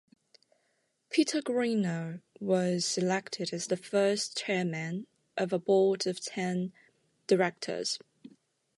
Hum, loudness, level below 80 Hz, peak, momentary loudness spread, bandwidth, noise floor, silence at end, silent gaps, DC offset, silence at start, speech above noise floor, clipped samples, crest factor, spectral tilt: none; -31 LUFS; -78 dBFS; -12 dBFS; 10 LU; 11.5 kHz; -76 dBFS; 0.8 s; none; under 0.1%; 1.1 s; 46 dB; under 0.1%; 18 dB; -4.5 dB/octave